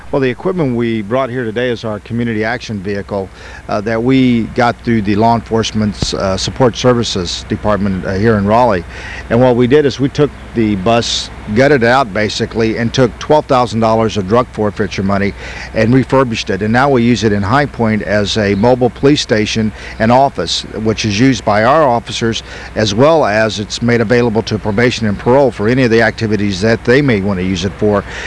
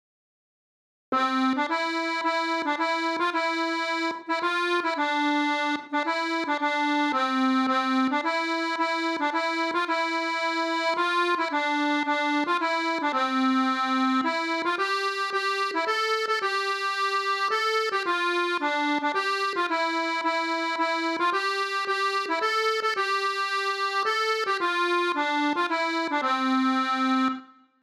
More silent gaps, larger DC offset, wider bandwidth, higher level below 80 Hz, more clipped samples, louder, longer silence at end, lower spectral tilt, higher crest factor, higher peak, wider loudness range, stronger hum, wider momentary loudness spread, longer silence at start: neither; first, 0.2% vs under 0.1%; second, 11 kHz vs 14 kHz; first, -34 dBFS vs -84 dBFS; neither; first, -13 LUFS vs -25 LUFS; second, 0 s vs 0.4 s; first, -5.5 dB/octave vs -1.5 dB/octave; about the same, 12 dB vs 12 dB; first, 0 dBFS vs -14 dBFS; about the same, 2 LU vs 1 LU; neither; first, 7 LU vs 3 LU; second, 0 s vs 1.1 s